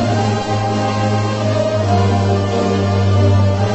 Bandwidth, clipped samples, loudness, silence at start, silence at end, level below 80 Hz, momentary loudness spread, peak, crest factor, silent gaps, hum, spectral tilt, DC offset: 8.4 kHz; under 0.1%; -16 LUFS; 0 s; 0 s; -40 dBFS; 4 LU; -2 dBFS; 12 dB; none; none; -7 dB/octave; under 0.1%